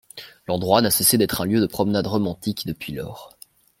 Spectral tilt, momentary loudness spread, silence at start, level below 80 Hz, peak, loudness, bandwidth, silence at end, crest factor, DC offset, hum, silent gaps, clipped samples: -4 dB/octave; 19 LU; 0.15 s; -52 dBFS; 0 dBFS; -21 LUFS; 16.5 kHz; 0.55 s; 22 dB; under 0.1%; none; none; under 0.1%